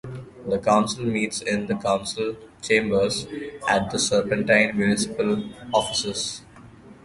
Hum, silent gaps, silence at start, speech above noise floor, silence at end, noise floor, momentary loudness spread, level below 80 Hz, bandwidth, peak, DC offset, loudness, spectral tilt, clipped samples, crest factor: none; none; 0.05 s; 23 dB; 0.1 s; -46 dBFS; 10 LU; -54 dBFS; 11.5 kHz; -4 dBFS; under 0.1%; -23 LUFS; -4 dB/octave; under 0.1%; 20 dB